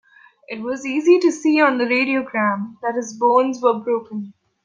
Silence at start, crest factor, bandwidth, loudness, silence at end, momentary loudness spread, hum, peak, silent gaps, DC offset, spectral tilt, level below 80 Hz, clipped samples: 0.5 s; 16 dB; 9.4 kHz; -19 LUFS; 0.35 s; 15 LU; none; -2 dBFS; none; under 0.1%; -5 dB/octave; -72 dBFS; under 0.1%